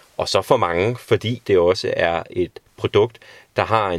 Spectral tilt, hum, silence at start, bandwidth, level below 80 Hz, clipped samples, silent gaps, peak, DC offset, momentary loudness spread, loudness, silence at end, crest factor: -5.5 dB/octave; none; 0.2 s; 14.5 kHz; -50 dBFS; under 0.1%; none; 0 dBFS; under 0.1%; 9 LU; -20 LUFS; 0 s; 20 dB